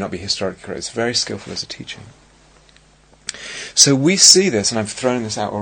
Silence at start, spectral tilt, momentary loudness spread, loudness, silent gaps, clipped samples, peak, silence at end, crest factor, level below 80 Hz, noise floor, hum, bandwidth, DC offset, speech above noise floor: 0 s; -2 dB/octave; 22 LU; -15 LUFS; none; under 0.1%; 0 dBFS; 0 s; 18 dB; -52 dBFS; -51 dBFS; none; 9.6 kHz; under 0.1%; 34 dB